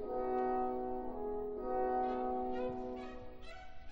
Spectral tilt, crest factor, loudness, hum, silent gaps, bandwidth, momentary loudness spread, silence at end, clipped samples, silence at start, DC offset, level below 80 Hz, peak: -8 dB/octave; 14 dB; -39 LUFS; none; none; 16 kHz; 17 LU; 0 s; under 0.1%; 0 s; under 0.1%; -54 dBFS; -26 dBFS